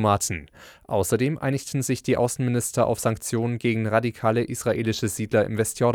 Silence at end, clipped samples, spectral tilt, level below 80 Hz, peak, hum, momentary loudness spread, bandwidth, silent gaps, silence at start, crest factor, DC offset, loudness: 0 s; under 0.1%; -5.5 dB/octave; -52 dBFS; -6 dBFS; none; 4 LU; 18 kHz; none; 0 s; 18 dB; under 0.1%; -24 LUFS